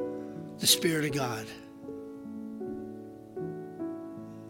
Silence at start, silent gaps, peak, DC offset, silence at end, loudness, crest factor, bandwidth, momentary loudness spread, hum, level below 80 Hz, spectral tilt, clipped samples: 0 s; none; -8 dBFS; under 0.1%; 0 s; -31 LUFS; 26 dB; 16.5 kHz; 20 LU; none; -66 dBFS; -3 dB/octave; under 0.1%